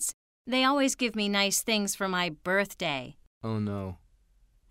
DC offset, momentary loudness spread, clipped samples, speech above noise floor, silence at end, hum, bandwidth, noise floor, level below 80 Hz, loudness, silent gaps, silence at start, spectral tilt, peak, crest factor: under 0.1%; 13 LU; under 0.1%; 35 dB; 0.75 s; none; 16 kHz; -64 dBFS; -62 dBFS; -28 LUFS; 0.14-0.45 s, 3.27-3.41 s; 0 s; -3 dB/octave; -10 dBFS; 20 dB